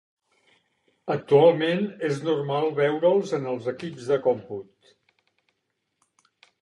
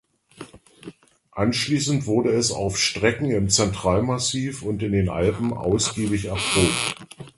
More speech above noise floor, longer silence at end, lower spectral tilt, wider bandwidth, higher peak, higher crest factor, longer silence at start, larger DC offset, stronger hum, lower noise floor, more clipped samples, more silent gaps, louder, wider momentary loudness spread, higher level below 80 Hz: first, 54 dB vs 23 dB; first, 2 s vs 0.1 s; first, -6.5 dB/octave vs -4 dB/octave; about the same, 11 kHz vs 12 kHz; second, -6 dBFS vs -2 dBFS; about the same, 20 dB vs 20 dB; first, 1.05 s vs 0.4 s; neither; neither; first, -78 dBFS vs -45 dBFS; neither; neither; about the same, -24 LUFS vs -22 LUFS; first, 15 LU vs 8 LU; second, -76 dBFS vs -42 dBFS